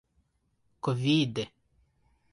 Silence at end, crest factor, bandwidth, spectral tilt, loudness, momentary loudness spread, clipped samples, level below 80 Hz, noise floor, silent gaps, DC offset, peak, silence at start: 0.85 s; 18 dB; 11 kHz; -6 dB/octave; -29 LUFS; 11 LU; under 0.1%; -66 dBFS; -74 dBFS; none; under 0.1%; -14 dBFS; 0.85 s